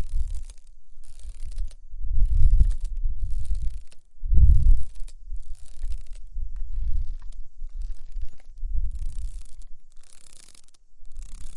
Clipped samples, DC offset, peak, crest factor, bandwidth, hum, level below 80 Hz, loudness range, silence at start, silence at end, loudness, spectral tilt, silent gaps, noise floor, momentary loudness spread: under 0.1%; under 0.1%; -2 dBFS; 20 dB; 0.5 kHz; none; -24 dBFS; 13 LU; 0 s; 0 s; -29 LUFS; -7 dB/octave; none; -43 dBFS; 23 LU